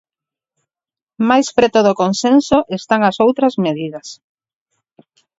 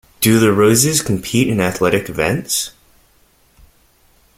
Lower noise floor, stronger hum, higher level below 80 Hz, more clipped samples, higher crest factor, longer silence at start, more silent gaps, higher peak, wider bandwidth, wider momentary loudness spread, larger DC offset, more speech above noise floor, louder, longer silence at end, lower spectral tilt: first, under -90 dBFS vs -54 dBFS; neither; second, -52 dBFS vs -46 dBFS; neither; about the same, 16 dB vs 18 dB; first, 1.2 s vs 0.2 s; neither; about the same, 0 dBFS vs 0 dBFS; second, 8 kHz vs 16.5 kHz; first, 11 LU vs 8 LU; neither; first, over 76 dB vs 40 dB; about the same, -14 LUFS vs -15 LUFS; second, 1.25 s vs 1.7 s; about the same, -5 dB/octave vs -4 dB/octave